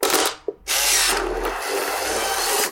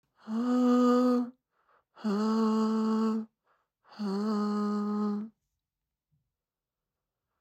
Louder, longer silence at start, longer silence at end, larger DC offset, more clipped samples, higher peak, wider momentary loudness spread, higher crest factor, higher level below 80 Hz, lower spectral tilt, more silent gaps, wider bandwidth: first, -20 LUFS vs -29 LUFS; second, 0 s vs 0.25 s; second, 0 s vs 2.1 s; neither; neither; first, -4 dBFS vs -16 dBFS; second, 9 LU vs 13 LU; about the same, 18 dB vs 16 dB; first, -42 dBFS vs -90 dBFS; second, 0 dB/octave vs -7.5 dB/octave; neither; first, 17 kHz vs 8.6 kHz